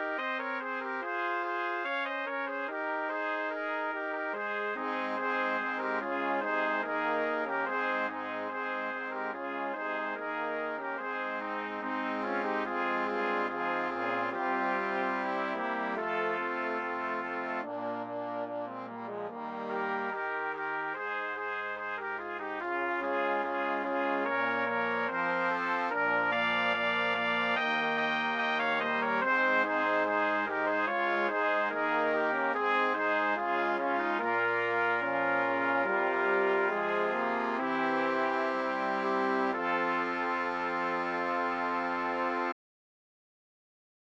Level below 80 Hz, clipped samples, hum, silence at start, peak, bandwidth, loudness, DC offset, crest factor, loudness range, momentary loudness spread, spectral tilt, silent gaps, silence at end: -74 dBFS; under 0.1%; none; 0 s; -16 dBFS; 8.4 kHz; -31 LUFS; under 0.1%; 16 dB; 6 LU; 7 LU; -5.5 dB/octave; none; 1.5 s